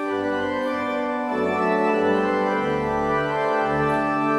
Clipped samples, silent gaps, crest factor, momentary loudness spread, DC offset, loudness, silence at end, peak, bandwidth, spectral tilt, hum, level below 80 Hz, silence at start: under 0.1%; none; 12 dB; 4 LU; under 0.1%; -22 LUFS; 0 s; -10 dBFS; 12 kHz; -6.5 dB/octave; none; -50 dBFS; 0 s